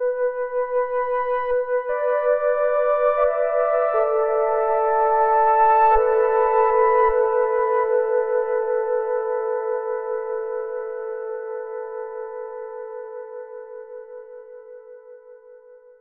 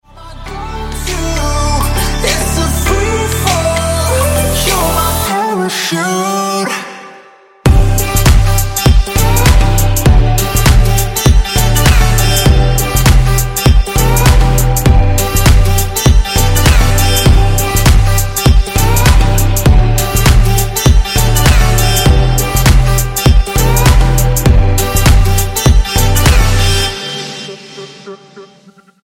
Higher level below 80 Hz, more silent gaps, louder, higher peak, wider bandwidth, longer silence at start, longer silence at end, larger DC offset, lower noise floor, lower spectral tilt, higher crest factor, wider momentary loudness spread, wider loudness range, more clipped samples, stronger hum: second, -50 dBFS vs -12 dBFS; neither; second, -21 LUFS vs -11 LUFS; second, -6 dBFS vs 0 dBFS; second, 3.7 kHz vs 17 kHz; second, 0 s vs 0.15 s; second, 0.25 s vs 0.6 s; neither; first, -47 dBFS vs -43 dBFS; first, -7 dB/octave vs -4.5 dB/octave; about the same, 14 dB vs 10 dB; first, 18 LU vs 6 LU; first, 17 LU vs 3 LU; neither; neither